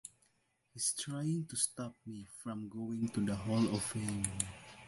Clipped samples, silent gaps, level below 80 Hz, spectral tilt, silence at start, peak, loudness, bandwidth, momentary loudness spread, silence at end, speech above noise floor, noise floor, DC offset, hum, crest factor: under 0.1%; none; -62 dBFS; -4.5 dB/octave; 0.05 s; -16 dBFS; -37 LUFS; 12 kHz; 13 LU; 0 s; 39 dB; -77 dBFS; under 0.1%; none; 22 dB